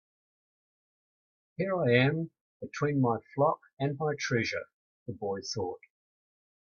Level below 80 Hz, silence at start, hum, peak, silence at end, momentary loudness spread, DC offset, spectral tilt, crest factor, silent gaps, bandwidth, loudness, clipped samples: -70 dBFS; 1.6 s; none; -10 dBFS; 0.85 s; 20 LU; under 0.1%; -6 dB/octave; 24 dB; 2.41-2.60 s, 3.73-3.77 s, 4.74-5.06 s; 7.2 kHz; -30 LUFS; under 0.1%